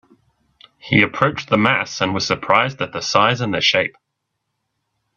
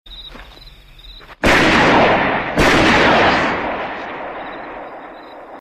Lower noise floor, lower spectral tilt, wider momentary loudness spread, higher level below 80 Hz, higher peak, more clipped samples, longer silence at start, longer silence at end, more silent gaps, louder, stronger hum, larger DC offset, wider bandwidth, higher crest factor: first, -76 dBFS vs -40 dBFS; about the same, -4 dB/octave vs -4.5 dB/octave; second, 5 LU vs 23 LU; second, -56 dBFS vs -34 dBFS; about the same, 0 dBFS vs -2 dBFS; neither; first, 0.85 s vs 0.05 s; first, 1.25 s vs 0 s; neither; second, -17 LUFS vs -13 LUFS; neither; neither; second, 7.4 kHz vs 15.5 kHz; about the same, 20 dB vs 16 dB